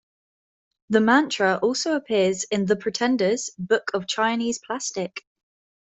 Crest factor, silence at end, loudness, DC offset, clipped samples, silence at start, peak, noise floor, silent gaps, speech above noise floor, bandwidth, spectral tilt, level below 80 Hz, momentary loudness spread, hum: 20 dB; 0.65 s; -23 LUFS; under 0.1%; under 0.1%; 0.9 s; -4 dBFS; under -90 dBFS; none; over 67 dB; 8.4 kHz; -3.5 dB/octave; -66 dBFS; 9 LU; none